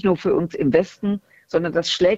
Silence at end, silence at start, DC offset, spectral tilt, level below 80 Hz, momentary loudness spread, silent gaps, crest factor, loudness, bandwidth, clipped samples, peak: 0 s; 0.05 s; under 0.1%; -5.5 dB/octave; -52 dBFS; 7 LU; none; 18 dB; -21 LUFS; 8 kHz; under 0.1%; -2 dBFS